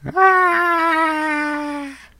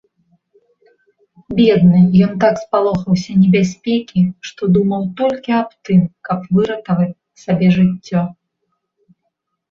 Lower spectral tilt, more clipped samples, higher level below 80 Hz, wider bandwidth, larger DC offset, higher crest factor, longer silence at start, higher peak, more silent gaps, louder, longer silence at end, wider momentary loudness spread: second, -4.5 dB/octave vs -8 dB/octave; neither; about the same, -54 dBFS vs -50 dBFS; first, 16 kHz vs 7 kHz; neither; about the same, 18 dB vs 14 dB; second, 0.05 s vs 1.5 s; about the same, 0 dBFS vs -2 dBFS; neither; about the same, -16 LUFS vs -15 LUFS; second, 0.25 s vs 1.4 s; first, 13 LU vs 10 LU